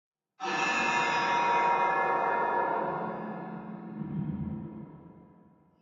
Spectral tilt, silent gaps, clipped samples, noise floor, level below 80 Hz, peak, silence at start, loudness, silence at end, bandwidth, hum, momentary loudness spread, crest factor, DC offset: -4.5 dB/octave; none; under 0.1%; -60 dBFS; -66 dBFS; -14 dBFS; 0.4 s; -29 LUFS; 0.6 s; 7.8 kHz; none; 15 LU; 16 dB; under 0.1%